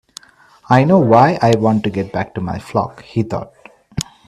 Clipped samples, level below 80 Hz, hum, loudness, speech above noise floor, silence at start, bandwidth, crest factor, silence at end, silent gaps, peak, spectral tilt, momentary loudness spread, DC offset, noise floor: under 0.1%; -48 dBFS; none; -16 LUFS; 33 dB; 0.7 s; 13.5 kHz; 16 dB; 0.25 s; none; 0 dBFS; -7 dB/octave; 16 LU; under 0.1%; -47 dBFS